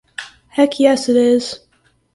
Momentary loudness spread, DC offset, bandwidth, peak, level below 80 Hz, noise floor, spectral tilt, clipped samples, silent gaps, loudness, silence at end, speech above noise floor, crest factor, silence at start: 19 LU; under 0.1%; 11.5 kHz; 0 dBFS; -58 dBFS; -59 dBFS; -3.5 dB/octave; under 0.1%; none; -15 LUFS; 0.6 s; 45 dB; 16 dB; 0.2 s